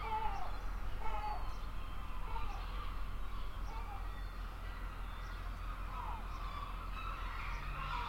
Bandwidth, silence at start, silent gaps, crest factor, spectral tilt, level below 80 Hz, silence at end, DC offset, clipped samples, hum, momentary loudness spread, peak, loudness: 16.5 kHz; 0 s; none; 16 dB; -5.5 dB/octave; -44 dBFS; 0 s; under 0.1%; under 0.1%; none; 5 LU; -24 dBFS; -45 LUFS